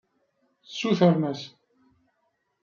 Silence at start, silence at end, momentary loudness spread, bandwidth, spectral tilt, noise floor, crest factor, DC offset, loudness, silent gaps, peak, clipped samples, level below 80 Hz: 0.7 s; 1.15 s; 18 LU; 7.2 kHz; -7 dB/octave; -74 dBFS; 22 dB; under 0.1%; -24 LUFS; none; -6 dBFS; under 0.1%; -72 dBFS